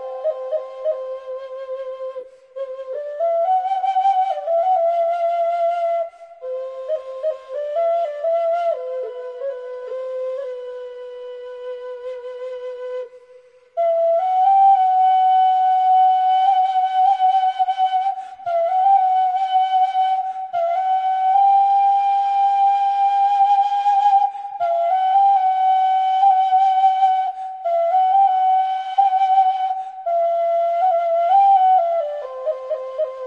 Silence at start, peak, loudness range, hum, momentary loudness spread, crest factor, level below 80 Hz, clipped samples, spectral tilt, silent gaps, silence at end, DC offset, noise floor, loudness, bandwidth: 0 s; -6 dBFS; 10 LU; none; 16 LU; 12 dB; -74 dBFS; under 0.1%; -0.5 dB/octave; none; 0 s; under 0.1%; -48 dBFS; -18 LUFS; 6 kHz